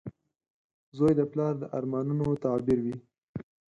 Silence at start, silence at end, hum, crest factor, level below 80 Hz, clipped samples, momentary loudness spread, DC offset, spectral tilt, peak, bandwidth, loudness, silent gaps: 0.05 s; 0.35 s; none; 18 dB; -60 dBFS; under 0.1%; 18 LU; under 0.1%; -10 dB/octave; -12 dBFS; 11 kHz; -29 LUFS; 0.50-0.92 s, 3.23-3.34 s